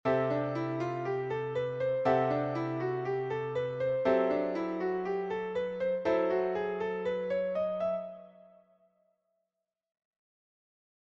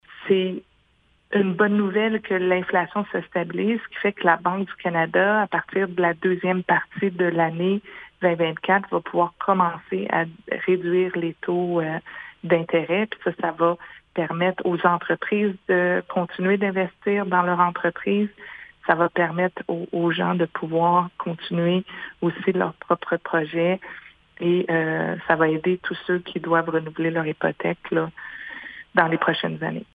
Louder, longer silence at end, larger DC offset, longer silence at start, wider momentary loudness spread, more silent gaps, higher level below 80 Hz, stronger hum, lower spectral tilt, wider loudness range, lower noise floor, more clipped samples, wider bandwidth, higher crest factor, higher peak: second, -32 LUFS vs -23 LUFS; first, 2.8 s vs 0.15 s; neither; about the same, 0.05 s vs 0.1 s; about the same, 6 LU vs 8 LU; neither; about the same, -68 dBFS vs -66 dBFS; neither; about the same, -8 dB/octave vs -9 dB/octave; first, 7 LU vs 2 LU; first, -87 dBFS vs -62 dBFS; neither; first, 7.2 kHz vs 4.8 kHz; about the same, 18 dB vs 22 dB; second, -14 dBFS vs 0 dBFS